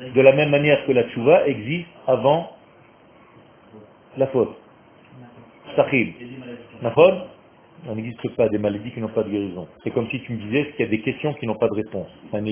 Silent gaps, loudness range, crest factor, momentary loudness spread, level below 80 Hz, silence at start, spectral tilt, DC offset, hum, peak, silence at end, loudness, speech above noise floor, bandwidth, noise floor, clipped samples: none; 5 LU; 22 dB; 16 LU; -58 dBFS; 0 s; -10.5 dB/octave; under 0.1%; none; 0 dBFS; 0 s; -21 LUFS; 30 dB; 3.6 kHz; -51 dBFS; under 0.1%